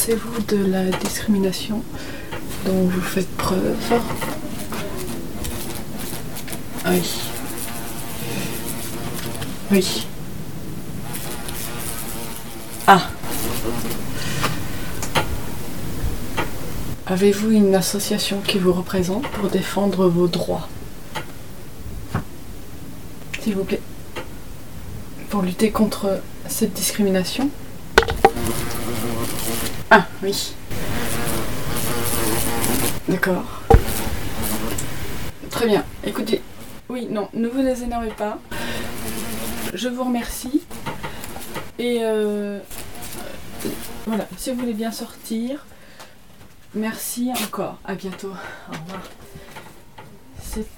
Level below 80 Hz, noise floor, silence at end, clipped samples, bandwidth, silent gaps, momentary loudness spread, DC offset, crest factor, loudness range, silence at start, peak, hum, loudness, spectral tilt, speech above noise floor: -36 dBFS; -47 dBFS; 0 s; under 0.1%; 19 kHz; none; 16 LU; 3%; 24 dB; 8 LU; 0 s; 0 dBFS; none; -23 LUFS; -4.5 dB/octave; 26 dB